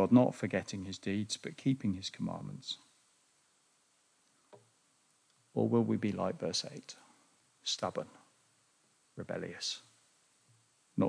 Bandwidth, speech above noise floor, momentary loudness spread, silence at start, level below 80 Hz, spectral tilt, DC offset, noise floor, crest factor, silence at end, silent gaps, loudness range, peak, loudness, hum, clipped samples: 10.5 kHz; 38 dB; 14 LU; 0 s; -78 dBFS; -5.5 dB/octave; under 0.1%; -72 dBFS; 24 dB; 0 s; none; 9 LU; -14 dBFS; -36 LUFS; none; under 0.1%